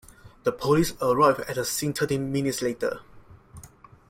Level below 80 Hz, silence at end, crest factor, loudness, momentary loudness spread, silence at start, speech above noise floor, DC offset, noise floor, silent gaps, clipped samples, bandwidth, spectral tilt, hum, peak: -54 dBFS; 0.4 s; 20 dB; -25 LUFS; 9 LU; 0.25 s; 26 dB; under 0.1%; -50 dBFS; none; under 0.1%; 16.5 kHz; -5 dB/octave; none; -8 dBFS